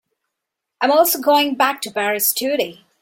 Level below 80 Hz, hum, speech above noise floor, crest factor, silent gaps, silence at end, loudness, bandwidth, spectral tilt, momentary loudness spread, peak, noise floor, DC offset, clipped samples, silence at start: -68 dBFS; none; 63 dB; 18 dB; none; 0.3 s; -17 LUFS; 17 kHz; -1.5 dB/octave; 7 LU; -2 dBFS; -81 dBFS; under 0.1%; under 0.1%; 0.8 s